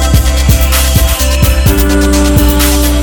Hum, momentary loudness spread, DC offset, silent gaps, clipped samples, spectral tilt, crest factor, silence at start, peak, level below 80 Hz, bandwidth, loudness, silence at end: none; 1 LU; under 0.1%; none; 0.3%; -4.5 dB/octave; 8 dB; 0 s; 0 dBFS; -10 dBFS; over 20 kHz; -9 LUFS; 0 s